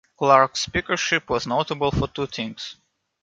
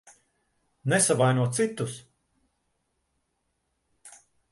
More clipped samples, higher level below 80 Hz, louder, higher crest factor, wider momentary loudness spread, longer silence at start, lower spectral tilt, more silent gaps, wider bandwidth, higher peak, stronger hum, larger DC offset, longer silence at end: neither; first, -44 dBFS vs -68 dBFS; first, -22 LUFS vs -25 LUFS; about the same, 22 dB vs 20 dB; about the same, 13 LU vs 14 LU; second, 0.2 s vs 0.85 s; about the same, -4 dB/octave vs -4.5 dB/octave; neither; second, 9.4 kHz vs 12 kHz; first, -2 dBFS vs -10 dBFS; neither; neither; about the same, 0.5 s vs 0.4 s